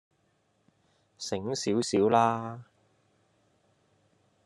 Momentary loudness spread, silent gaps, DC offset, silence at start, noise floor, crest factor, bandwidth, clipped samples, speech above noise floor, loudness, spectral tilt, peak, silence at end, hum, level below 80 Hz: 17 LU; none; under 0.1%; 1.2 s; -72 dBFS; 22 dB; 11.5 kHz; under 0.1%; 44 dB; -28 LUFS; -5 dB/octave; -10 dBFS; 1.8 s; none; -74 dBFS